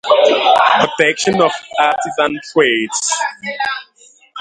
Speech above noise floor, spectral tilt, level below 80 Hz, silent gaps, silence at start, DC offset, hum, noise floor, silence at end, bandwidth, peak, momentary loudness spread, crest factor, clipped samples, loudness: 22 dB; -2.5 dB/octave; -58 dBFS; none; 0.05 s; under 0.1%; none; -38 dBFS; 0 s; 11 kHz; 0 dBFS; 10 LU; 14 dB; under 0.1%; -14 LUFS